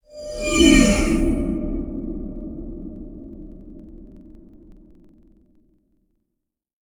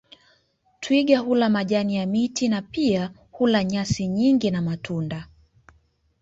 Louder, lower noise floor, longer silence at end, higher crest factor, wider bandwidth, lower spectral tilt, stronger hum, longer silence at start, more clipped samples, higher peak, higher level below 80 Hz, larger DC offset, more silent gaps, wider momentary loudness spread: first, -19 LUFS vs -23 LUFS; first, -80 dBFS vs -64 dBFS; first, 2.5 s vs 0.95 s; about the same, 22 dB vs 18 dB; first, over 20 kHz vs 8 kHz; second, -4 dB/octave vs -6 dB/octave; neither; second, 0.15 s vs 0.8 s; neither; about the same, -2 dBFS vs -4 dBFS; first, -32 dBFS vs -54 dBFS; neither; neither; first, 27 LU vs 9 LU